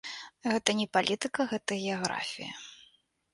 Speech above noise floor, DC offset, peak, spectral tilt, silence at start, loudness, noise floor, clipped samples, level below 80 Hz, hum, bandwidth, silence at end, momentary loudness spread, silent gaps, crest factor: 34 dB; under 0.1%; -6 dBFS; -3 dB/octave; 0.05 s; -31 LUFS; -65 dBFS; under 0.1%; -72 dBFS; none; 11.5 kHz; 0.5 s; 13 LU; none; 26 dB